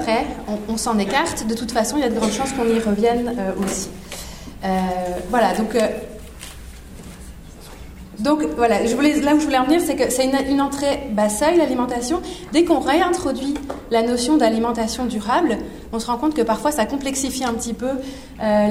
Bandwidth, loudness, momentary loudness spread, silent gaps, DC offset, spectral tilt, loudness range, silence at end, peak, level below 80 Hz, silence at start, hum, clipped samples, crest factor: 16 kHz; -20 LUFS; 19 LU; none; under 0.1%; -4.5 dB/octave; 5 LU; 0 s; -4 dBFS; -40 dBFS; 0 s; none; under 0.1%; 16 dB